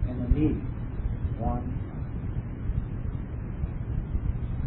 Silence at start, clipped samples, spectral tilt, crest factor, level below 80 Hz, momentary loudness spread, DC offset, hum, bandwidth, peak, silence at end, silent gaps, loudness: 0 s; under 0.1%; -12.5 dB/octave; 20 dB; -32 dBFS; 8 LU; under 0.1%; none; 3.9 kHz; -10 dBFS; 0 s; none; -32 LUFS